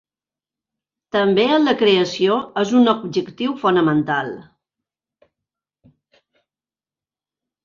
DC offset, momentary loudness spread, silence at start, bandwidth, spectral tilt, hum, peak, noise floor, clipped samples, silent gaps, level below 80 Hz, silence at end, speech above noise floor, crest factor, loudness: under 0.1%; 9 LU; 1.15 s; 7.4 kHz; -5.5 dB/octave; none; -4 dBFS; under -90 dBFS; under 0.1%; none; -62 dBFS; 3.2 s; over 73 dB; 18 dB; -18 LUFS